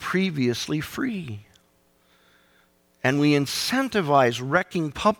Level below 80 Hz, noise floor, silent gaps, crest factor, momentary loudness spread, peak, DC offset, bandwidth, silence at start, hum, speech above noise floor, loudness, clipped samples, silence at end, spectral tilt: -58 dBFS; -63 dBFS; none; 18 dB; 9 LU; -6 dBFS; under 0.1%; 18.5 kHz; 0 s; none; 40 dB; -23 LUFS; under 0.1%; 0.05 s; -5 dB/octave